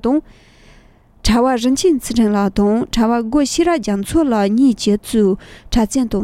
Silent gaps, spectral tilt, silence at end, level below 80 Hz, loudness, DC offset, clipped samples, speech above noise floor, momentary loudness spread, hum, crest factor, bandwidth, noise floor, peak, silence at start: none; -5 dB/octave; 0 s; -32 dBFS; -16 LUFS; under 0.1%; under 0.1%; 32 dB; 5 LU; none; 12 dB; 15.5 kHz; -47 dBFS; -2 dBFS; 0.05 s